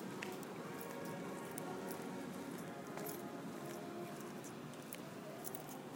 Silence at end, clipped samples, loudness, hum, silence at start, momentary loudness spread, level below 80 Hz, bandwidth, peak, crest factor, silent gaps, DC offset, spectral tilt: 0 s; under 0.1%; -47 LUFS; none; 0 s; 3 LU; -84 dBFS; 17 kHz; -24 dBFS; 24 dB; none; under 0.1%; -4.5 dB/octave